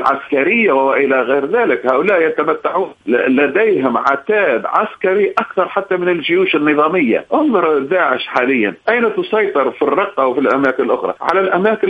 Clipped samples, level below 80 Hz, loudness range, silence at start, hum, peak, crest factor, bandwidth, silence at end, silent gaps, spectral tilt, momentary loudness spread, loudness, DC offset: under 0.1%; -60 dBFS; 1 LU; 0 s; none; 0 dBFS; 14 dB; 6.4 kHz; 0 s; none; -7 dB/octave; 4 LU; -14 LUFS; under 0.1%